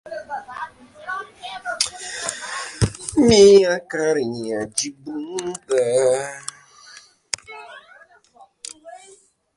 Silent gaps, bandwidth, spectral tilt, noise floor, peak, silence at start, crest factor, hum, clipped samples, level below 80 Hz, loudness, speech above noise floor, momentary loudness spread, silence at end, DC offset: none; 11.5 kHz; -4 dB/octave; -52 dBFS; -2 dBFS; 0.05 s; 20 dB; none; under 0.1%; -46 dBFS; -20 LUFS; 35 dB; 22 LU; 0.6 s; under 0.1%